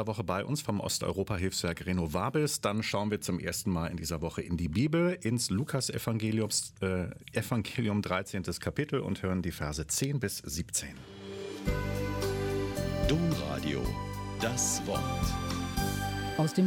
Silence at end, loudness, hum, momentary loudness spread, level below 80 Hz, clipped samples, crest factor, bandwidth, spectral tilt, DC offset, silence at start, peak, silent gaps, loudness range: 0 s; -32 LUFS; none; 6 LU; -46 dBFS; under 0.1%; 18 dB; 17.5 kHz; -4.5 dB/octave; under 0.1%; 0 s; -14 dBFS; none; 3 LU